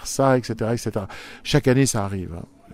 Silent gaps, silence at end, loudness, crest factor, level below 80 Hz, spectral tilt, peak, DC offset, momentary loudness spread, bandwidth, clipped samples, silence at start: none; 0.3 s; -22 LUFS; 18 dB; -44 dBFS; -5 dB/octave; -4 dBFS; under 0.1%; 16 LU; 16 kHz; under 0.1%; 0 s